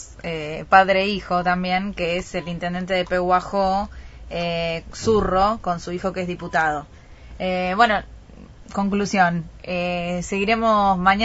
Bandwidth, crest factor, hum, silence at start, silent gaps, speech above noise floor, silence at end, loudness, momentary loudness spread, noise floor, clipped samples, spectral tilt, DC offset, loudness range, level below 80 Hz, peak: 8 kHz; 22 dB; none; 0 s; none; 22 dB; 0 s; -21 LUFS; 11 LU; -43 dBFS; under 0.1%; -5 dB/octave; under 0.1%; 3 LU; -42 dBFS; 0 dBFS